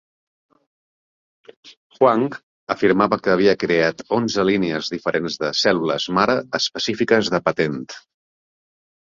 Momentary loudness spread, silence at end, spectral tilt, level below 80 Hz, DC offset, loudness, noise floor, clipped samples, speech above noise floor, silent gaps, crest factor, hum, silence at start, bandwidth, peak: 7 LU; 1.1 s; -4.5 dB/octave; -58 dBFS; under 0.1%; -19 LUFS; under -90 dBFS; under 0.1%; over 71 dB; 1.77-1.90 s, 2.43-2.67 s; 18 dB; none; 1.65 s; 7.6 kHz; -2 dBFS